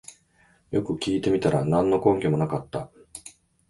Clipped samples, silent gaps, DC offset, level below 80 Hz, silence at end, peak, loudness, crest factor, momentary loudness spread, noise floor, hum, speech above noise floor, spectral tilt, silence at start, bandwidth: under 0.1%; none; under 0.1%; -54 dBFS; 0.4 s; -6 dBFS; -24 LUFS; 20 dB; 20 LU; -61 dBFS; none; 38 dB; -7 dB/octave; 0.1 s; 11.5 kHz